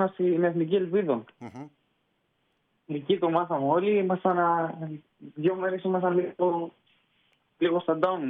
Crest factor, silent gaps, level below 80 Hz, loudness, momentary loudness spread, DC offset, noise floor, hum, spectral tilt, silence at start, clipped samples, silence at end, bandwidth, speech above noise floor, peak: 18 dB; none; -80 dBFS; -26 LUFS; 15 LU; under 0.1%; -74 dBFS; none; -9.5 dB/octave; 0 s; under 0.1%; 0 s; 3.9 kHz; 47 dB; -10 dBFS